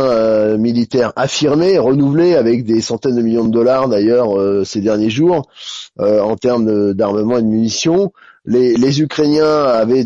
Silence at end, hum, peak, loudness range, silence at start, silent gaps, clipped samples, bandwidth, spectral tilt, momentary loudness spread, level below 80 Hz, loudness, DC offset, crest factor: 0 s; none; -4 dBFS; 2 LU; 0 s; none; under 0.1%; 7.8 kHz; -6 dB/octave; 4 LU; -52 dBFS; -14 LUFS; under 0.1%; 10 dB